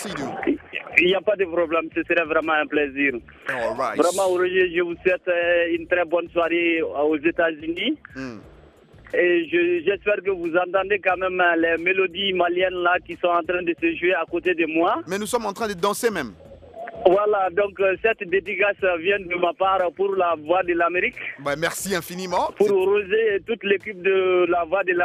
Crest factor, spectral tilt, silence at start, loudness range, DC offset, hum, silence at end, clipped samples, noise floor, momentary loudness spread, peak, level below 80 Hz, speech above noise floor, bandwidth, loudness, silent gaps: 22 dB; -4 dB/octave; 0 s; 2 LU; under 0.1%; none; 0 s; under 0.1%; -49 dBFS; 6 LU; 0 dBFS; -56 dBFS; 27 dB; 15.5 kHz; -22 LUFS; none